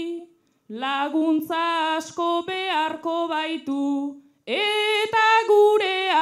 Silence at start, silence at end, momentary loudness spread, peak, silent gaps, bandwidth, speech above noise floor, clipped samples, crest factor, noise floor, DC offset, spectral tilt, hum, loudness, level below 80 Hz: 0 s; 0 s; 12 LU; -8 dBFS; none; 14.5 kHz; 26 dB; under 0.1%; 14 dB; -50 dBFS; under 0.1%; -2.5 dB/octave; none; -22 LUFS; -80 dBFS